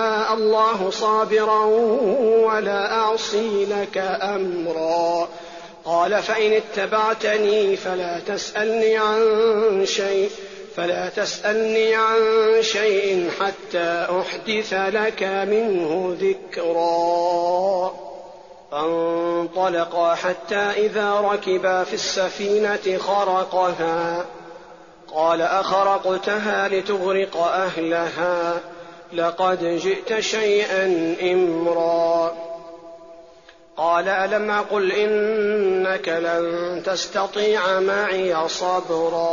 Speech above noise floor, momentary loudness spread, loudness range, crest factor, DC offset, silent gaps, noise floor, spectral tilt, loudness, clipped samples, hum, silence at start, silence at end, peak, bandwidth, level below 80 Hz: 28 dB; 7 LU; 3 LU; 12 dB; 0.1%; none; -48 dBFS; -2 dB/octave; -21 LUFS; under 0.1%; none; 0 s; 0 s; -8 dBFS; 7.4 kHz; -64 dBFS